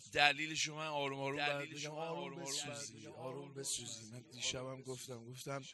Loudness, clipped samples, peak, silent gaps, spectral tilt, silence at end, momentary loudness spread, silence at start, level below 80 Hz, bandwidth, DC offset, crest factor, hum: -40 LUFS; under 0.1%; -12 dBFS; none; -2 dB/octave; 0 s; 14 LU; 0 s; -76 dBFS; 12 kHz; under 0.1%; 30 dB; none